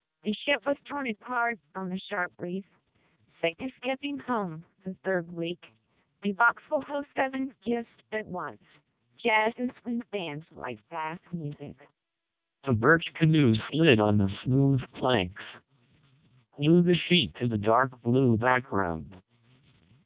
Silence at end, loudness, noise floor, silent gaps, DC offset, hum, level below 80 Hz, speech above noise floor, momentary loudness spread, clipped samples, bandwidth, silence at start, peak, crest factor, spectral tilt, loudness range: 0.85 s; -28 LUFS; -86 dBFS; none; under 0.1%; none; -56 dBFS; 59 dB; 15 LU; under 0.1%; 4 kHz; 0.25 s; -6 dBFS; 22 dB; -10 dB/octave; 9 LU